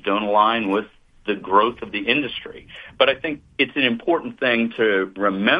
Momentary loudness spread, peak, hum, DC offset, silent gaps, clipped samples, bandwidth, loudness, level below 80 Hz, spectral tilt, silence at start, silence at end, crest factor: 11 LU; -2 dBFS; none; under 0.1%; none; under 0.1%; 5.2 kHz; -20 LUFS; -56 dBFS; -7 dB/octave; 0.05 s; 0 s; 20 dB